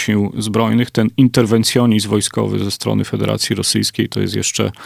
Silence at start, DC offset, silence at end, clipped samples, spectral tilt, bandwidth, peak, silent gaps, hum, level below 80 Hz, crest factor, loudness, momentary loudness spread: 0 s; under 0.1%; 0 s; under 0.1%; -5 dB/octave; 16 kHz; 0 dBFS; none; none; -44 dBFS; 16 dB; -16 LUFS; 5 LU